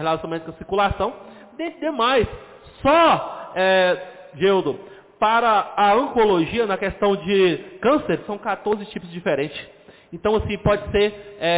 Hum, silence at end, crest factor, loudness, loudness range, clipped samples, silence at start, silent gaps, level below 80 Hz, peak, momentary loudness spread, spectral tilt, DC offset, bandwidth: none; 0 s; 12 dB; -20 LUFS; 4 LU; under 0.1%; 0 s; none; -42 dBFS; -8 dBFS; 13 LU; -9.5 dB/octave; under 0.1%; 4 kHz